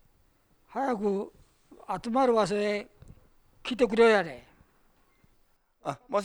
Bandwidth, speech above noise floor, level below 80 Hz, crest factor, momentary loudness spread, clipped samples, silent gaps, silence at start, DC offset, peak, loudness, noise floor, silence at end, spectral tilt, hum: 11.5 kHz; 40 dB; -60 dBFS; 20 dB; 18 LU; under 0.1%; none; 0.7 s; under 0.1%; -10 dBFS; -28 LUFS; -67 dBFS; 0 s; -5 dB/octave; none